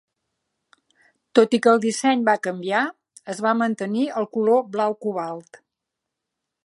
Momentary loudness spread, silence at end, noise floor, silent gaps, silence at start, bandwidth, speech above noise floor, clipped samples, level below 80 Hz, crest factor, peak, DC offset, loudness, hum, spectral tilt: 11 LU; 1.25 s; -83 dBFS; none; 1.35 s; 11.5 kHz; 63 dB; under 0.1%; -78 dBFS; 22 dB; -2 dBFS; under 0.1%; -21 LUFS; none; -4.5 dB/octave